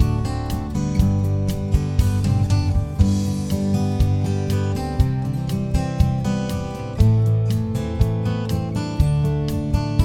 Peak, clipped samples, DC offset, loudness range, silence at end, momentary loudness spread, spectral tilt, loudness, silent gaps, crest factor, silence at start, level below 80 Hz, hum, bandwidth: -2 dBFS; under 0.1%; under 0.1%; 1 LU; 0 s; 5 LU; -7.5 dB/octave; -21 LUFS; none; 18 dB; 0 s; -26 dBFS; none; 15.5 kHz